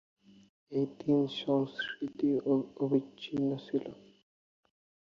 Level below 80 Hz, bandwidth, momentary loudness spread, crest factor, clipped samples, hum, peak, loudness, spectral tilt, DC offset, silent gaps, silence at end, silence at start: -74 dBFS; 6.8 kHz; 7 LU; 18 dB; under 0.1%; none; -16 dBFS; -33 LUFS; -7.5 dB/octave; under 0.1%; none; 1.1 s; 0.7 s